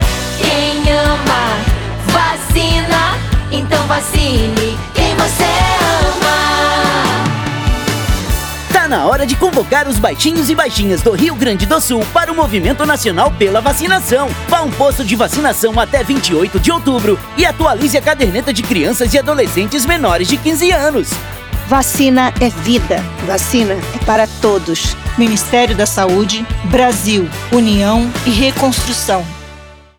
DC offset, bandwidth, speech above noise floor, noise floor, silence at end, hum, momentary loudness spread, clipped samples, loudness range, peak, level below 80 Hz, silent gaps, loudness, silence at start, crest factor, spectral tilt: under 0.1%; over 20 kHz; 23 dB; -35 dBFS; 0.25 s; none; 5 LU; under 0.1%; 1 LU; 0 dBFS; -24 dBFS; none; -13 LUFS; 0 s; 12 dB; -4 dB/octave